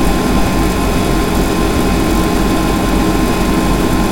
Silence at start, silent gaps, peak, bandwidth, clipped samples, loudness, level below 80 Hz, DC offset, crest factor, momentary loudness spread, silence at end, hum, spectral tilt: 0 s; none; 0 dBFS; 17.5 kHz; under 0.1%; -14 LUFS; -18 dBFS; under 0.1%; 12 dB; 1 LU; 0 s; none; -5.5 dB/octave